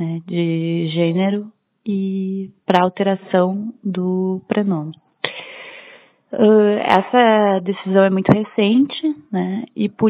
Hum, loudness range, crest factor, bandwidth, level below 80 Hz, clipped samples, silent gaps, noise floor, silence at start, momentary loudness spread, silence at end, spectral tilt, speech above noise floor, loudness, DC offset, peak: none; 6 LU; 18 dB; 5.8 kHz; -62 dBFS; under 0.1%; none; -46 dBFS; 0 s; 13 LU; 0 s; -8.5 dB/octave; 29 dB; -18 LUFS; under 0.1%; 0 dBFS